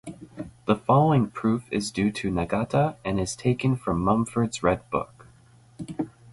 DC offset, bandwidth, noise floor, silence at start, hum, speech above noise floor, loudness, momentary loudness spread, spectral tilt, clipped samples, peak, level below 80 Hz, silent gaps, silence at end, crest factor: under 0.1%; 11.5 kHz; -55 dBFS; 0.05 s; none; 31 dB; -25 LUFS; 15 LU; -6.5 dB/octave; under 0.1%; -8 dBFS; -48 dBFS; none; 0 s; 18 dB